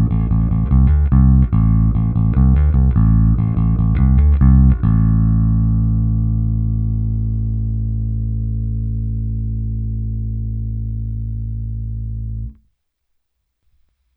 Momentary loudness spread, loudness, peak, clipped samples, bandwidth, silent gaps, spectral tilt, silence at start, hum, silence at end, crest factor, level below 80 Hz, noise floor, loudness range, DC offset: 12 LU; -17 LUFS; 0 dBFS; under 0.1%; 2.5 kHz; none; -14 dB/octave; 0 s; none; 1.65 s; 14 dB; -18 dBFS; -69 dBFS; 11 LU; under 0.1%